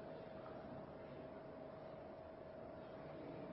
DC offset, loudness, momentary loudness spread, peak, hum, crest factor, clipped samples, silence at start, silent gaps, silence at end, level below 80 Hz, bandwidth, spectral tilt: under 0.1%; -54 LUFS; 2 LU; -40 dBFS; none; 14 dB; under 0.1%; 0 s; none; 0 s; -72 dBFS; 5.6 kHz; -6 dB/octave